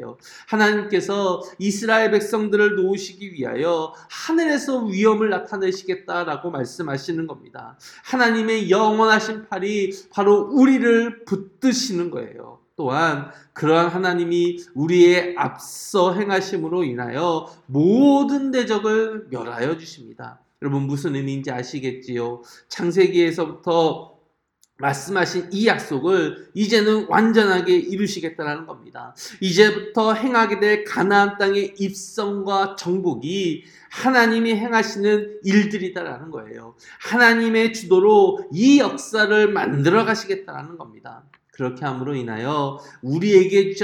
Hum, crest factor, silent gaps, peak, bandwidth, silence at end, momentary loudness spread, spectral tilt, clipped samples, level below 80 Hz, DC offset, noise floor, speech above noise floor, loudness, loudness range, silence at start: none; 20 dB; none; 0 dBFS; 17 kHz; 0 s; 15 LU; -5 dB/octave; under 0.1%; -68 dBFS; under 0.1%; -64 dBFS; 45 dB; -20 LUFS; 6 LU; 0 s